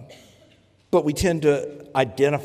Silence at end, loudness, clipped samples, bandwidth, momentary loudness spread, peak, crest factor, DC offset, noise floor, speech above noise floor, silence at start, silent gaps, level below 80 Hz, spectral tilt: 0 s; -22 LUFS; under 0.1%; 15.5 kHz; 5 LU; -6 dBFS; 18 dB; under 0.1%; -56 dBFS; 35 dB; 0 s; none; -46 dBFS; -5.5 dB/octave